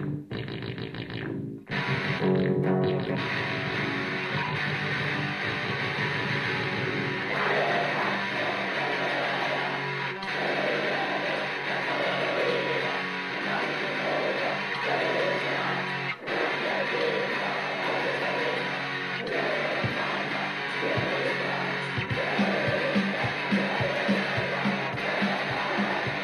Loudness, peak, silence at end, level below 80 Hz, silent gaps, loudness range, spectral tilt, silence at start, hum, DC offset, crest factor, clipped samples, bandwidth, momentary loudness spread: -27 LUFS; -14 dBFS; 0 s; -62 dBFS; none; 1 LU; -5.5 dB/octave; 0 s; none; under 0.1%; 14 dB; under 0.1%; 12.5 kHz; 4 LU